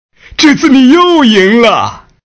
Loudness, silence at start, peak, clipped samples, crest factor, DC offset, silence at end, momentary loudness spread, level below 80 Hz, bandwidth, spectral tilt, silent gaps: -6 LUFS; 0.4 s; 0 dBFS; 6%; 8 dB; under 0.1%; 0.25 s; 9 LU; -42 dBFS; 8 kHz; -4 dB/octave; none